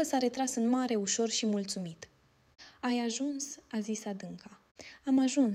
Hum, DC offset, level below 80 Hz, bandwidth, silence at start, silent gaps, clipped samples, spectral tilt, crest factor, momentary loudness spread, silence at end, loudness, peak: none; under 0.1%; -76 dBFS; 14.5 kHz; 0 s; 4.71-4.75 s; under 0.1%; -3.5 dB/octave; 16 dB; 18 LU; 0 s; -32 LUFS; -18 dBFS